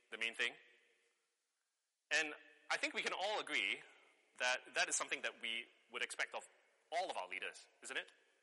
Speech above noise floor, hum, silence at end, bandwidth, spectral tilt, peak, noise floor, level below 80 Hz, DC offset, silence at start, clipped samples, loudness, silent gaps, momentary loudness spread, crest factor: 47 dB; none; 0.35 s; 11.5 kHz; 1 dB/octave; -22 dBFS; -89 dBFS; under -90 dBFS; under 0.1%; 0.1 s; under 0.1%; -41 LUFS; none; 8 LU; 24 dB